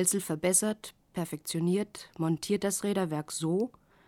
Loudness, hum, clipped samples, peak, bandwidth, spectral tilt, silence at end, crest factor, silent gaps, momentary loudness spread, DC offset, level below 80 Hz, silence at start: -31 LUFS; none; under 0.1%; -12 dBFS; 18 kHz; -4.5 dB/octave; 0.4 s; 20 dB; none; 11 LU; under 0.1%; -68 dBFS; 0 s